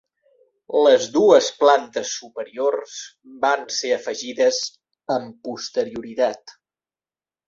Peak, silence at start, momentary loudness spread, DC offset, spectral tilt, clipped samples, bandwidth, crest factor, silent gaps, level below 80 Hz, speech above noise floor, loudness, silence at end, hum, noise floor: -2 dBFS; 0.7 s; 18 LU; under 0.1%; -2.5 dB/octave; under 0.1%; 7.8 kHz; 20 dB; none; -68 dBFS; over 70 dB; -20 LUFS; 1 s; none; under -90 dBFS